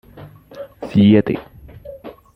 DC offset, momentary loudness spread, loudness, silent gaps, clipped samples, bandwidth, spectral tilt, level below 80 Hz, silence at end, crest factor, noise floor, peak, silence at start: under 0.1%; 25 LU; -15 LUFS; none; under 0.1%; 5.2 kHz; -9 dB/octave; -48 dBFS; 0.25 s; 16 dB; -40 dBFS; -2 dBFS; 0.15 s